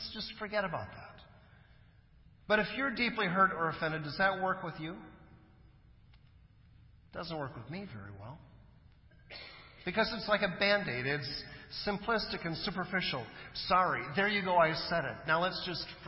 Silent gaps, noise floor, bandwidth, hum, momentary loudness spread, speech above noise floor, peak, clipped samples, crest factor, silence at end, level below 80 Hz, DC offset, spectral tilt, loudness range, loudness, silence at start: none; -61 dBFS; 5.8 kHz; none; 19 LU; 27 dB; -14 dBFS; under 0.1%; 20 dB; 0 s; -60 dBFS; under 0.1%; -8 dB/octave; 15 LU; -33 LUFS; 0 s